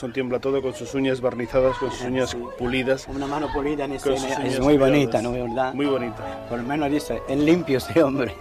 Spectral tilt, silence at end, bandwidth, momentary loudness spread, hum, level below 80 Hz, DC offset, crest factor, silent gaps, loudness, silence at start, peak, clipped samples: -6 dB/octave; 0 s; 15 kHz; 8 LU; none; -44 dBFS; under 0.1%; 16 dB; none; -23 LUFS; 0 s; -6 dBFS; under 0.1%